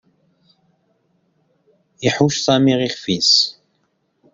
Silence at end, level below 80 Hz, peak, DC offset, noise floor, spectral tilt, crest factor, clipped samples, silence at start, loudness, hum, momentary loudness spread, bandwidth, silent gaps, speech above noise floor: 0.85 s; -58 dBFS; -2 dBFS; under 0.1%; -67 dBFS; -4 dB/octave; 20 dB; under 0.1%; 2 s; -16 LUFS; none; 9 LU; 7.8 kHz; none; 50 dB